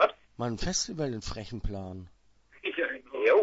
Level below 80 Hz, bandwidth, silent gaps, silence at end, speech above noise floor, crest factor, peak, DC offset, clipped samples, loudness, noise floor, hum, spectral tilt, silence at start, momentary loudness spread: -44 dBFS; 8 kHz; none; 0 s; 25 dB; 20 dB; -10 dBFS; under 0.1%; under 0.1%; -32 LUFS; -58 dBFS; none; -4 dB/octave; 0 s; 11 LU